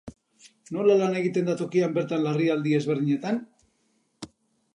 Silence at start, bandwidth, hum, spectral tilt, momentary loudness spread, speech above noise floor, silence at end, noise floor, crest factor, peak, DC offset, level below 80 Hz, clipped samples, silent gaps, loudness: 0.05 s; 10.5 kHz; none; -7 dB/octave; 20 LU; 46 dB; 0.5 s; -70 dBFS; 16 dB; -10 dBFS; under 0.1%; -66 dBFS; under 0.1%; none; -25 LUFS